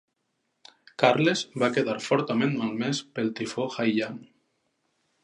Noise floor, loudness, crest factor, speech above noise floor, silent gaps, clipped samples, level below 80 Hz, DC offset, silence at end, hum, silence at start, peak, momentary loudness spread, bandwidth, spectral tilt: -77 dBFS; -26 LUFS; 26 dB; 51 dB; none; under 0.1%; -74 dBFS; under 0.1%; 1 s; none; 1 s; -2 dBFS; 8 LU; 11 kHz; -5 dB/octave